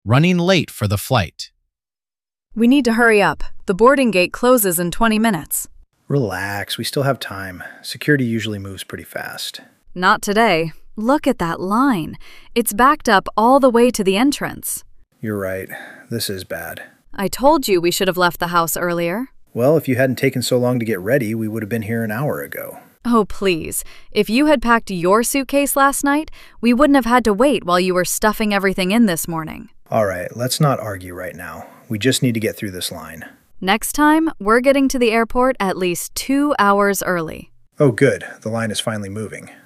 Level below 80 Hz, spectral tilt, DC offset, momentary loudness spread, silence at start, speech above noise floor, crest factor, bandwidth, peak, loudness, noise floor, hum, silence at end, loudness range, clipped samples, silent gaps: -40 dBFS; -4.5 dB/octave; under 0.1%; 15 LU; 0.05 s; over 73 dB; 16 dB; 15.5 kHz; 0 dBFS; -17 LUFS; under -90 dBFS; none; 0.15 s; 6 LU; under 0.1%; none